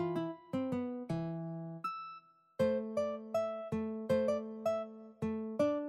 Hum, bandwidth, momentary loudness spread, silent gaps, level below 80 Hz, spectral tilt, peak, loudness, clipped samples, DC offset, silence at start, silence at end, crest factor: none; 13 kHz; 9 LU; none; -68 dBFS; -7.5 dB/octave; -20 dBFS; -37 LUFS; under 0.1%; under 0.1%; 0 s; 0 s; 16 dB